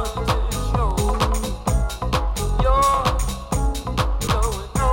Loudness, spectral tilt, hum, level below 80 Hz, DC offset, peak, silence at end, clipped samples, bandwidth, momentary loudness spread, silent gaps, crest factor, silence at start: -22 LUFS; -5 dB/octave; none; -24 dBFS; under 0.1%; -6 dBFS; 0 s; under 0.1%; 17 kHz; 6 LU; none; 14 dB; 0 s